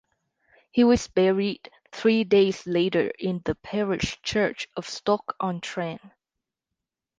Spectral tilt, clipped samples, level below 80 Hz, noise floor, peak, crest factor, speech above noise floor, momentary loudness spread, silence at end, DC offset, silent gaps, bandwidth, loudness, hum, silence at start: -5.5 dB/octave; under 0.1%; -52 dBFS; -86 dBFS; -8 dBFS; 16 dB; 62 dB; 12 LU; 1.1 s; under 0.1%; none; 9.6 kHz; -25 LUFS; none; 0.75 s